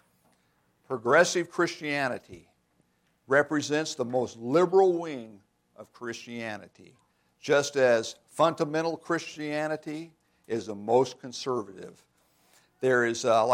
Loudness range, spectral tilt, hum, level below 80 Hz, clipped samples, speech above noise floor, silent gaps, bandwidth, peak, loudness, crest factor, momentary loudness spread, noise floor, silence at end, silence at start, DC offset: 4 LU; -4.5 dB/octave; none; -76 dBFS; under 0.1%; 43 dB; none; 15 kHz; -8 dBFS; -27 LUFS; 22 dB; 16 LU; -70 dBFS; 0 s; 0.9 s; under 0.1%